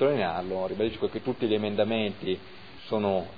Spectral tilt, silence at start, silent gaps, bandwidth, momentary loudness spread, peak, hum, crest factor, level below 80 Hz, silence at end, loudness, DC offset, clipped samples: -8.5 dB/octave; 0 s; none; 5 kHz; 7 LU; -12 dBFS; none; 16 dB; -60 dBFS; 0 s; -29 LUFS; 0.4%; under 0.1%